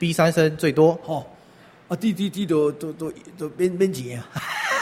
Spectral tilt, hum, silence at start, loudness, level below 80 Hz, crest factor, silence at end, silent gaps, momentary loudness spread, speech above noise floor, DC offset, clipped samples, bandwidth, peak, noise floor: -6 dB/octave; none; 0 s; -23 LUFS; -60 dBFS; 18 dB; 0 s; none; 14 LU; 28 dB; under 0.1%; under 0.1%; 16 kHz; -4 dBFS; -50 dBFS